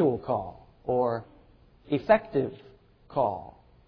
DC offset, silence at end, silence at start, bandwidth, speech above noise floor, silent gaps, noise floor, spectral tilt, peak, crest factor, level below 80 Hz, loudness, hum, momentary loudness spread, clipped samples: under 0.1%; 0.35 s; 0 s; 5.4 kHz; 30 dB; none; -57 dBFS; -10 dB/octave; -8 dBFS; 22 dB; -56 dBFS; -28 LUFS; none; 16 LU; under 0.1%